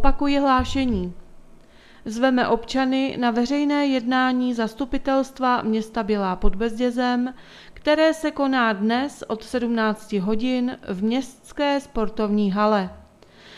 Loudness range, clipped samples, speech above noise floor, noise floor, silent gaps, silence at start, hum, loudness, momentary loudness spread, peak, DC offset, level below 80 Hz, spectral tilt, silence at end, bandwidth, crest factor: 2 LU; under 0.1%; 27 dB; -49 dBFS; none; 0 s; none; -22 LUFS; 8 LU; -2 dBFS; under 0.1%; -38 dBFS; -5.5 dB/octave; 0 s; 12.5 kHz; 20 dB